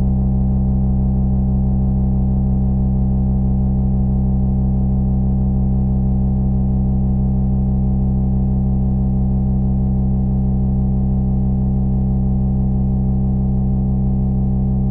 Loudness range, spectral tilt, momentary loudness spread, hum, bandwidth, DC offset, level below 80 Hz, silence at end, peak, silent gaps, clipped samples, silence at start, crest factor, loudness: 0 LU; -14.5 dB/octave; 1 LU; none; 1.3 kHz; under 0.1%; -20 dBFS; 0 s; -8 dBFS; none; under 0.1%; 0 s; 8 dB; -18 LUFS